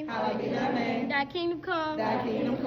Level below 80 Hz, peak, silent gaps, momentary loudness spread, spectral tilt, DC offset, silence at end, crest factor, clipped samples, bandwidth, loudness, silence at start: -60 dBFS; -16 dBFS; none; 2 LU; -6.5 dB/octave; under 0.1%; 0 s; 14 dB; under 0.1%; 7 kHz; -30 LUFS; 0 s